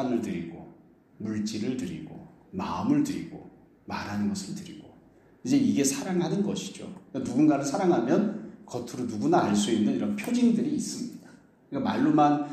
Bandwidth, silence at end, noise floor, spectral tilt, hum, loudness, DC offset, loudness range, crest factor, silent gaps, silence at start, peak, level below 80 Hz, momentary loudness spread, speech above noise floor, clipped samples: 14.5 kHz; 0 s; -57 dBFS; -5.5 dB/octave; none; -27 LUFS; under 0.1%; 6 LU; 18 dB; none; 0 s; -10 dBFS; -64 dBFS; 17 LU; 30 dB; under 0.1%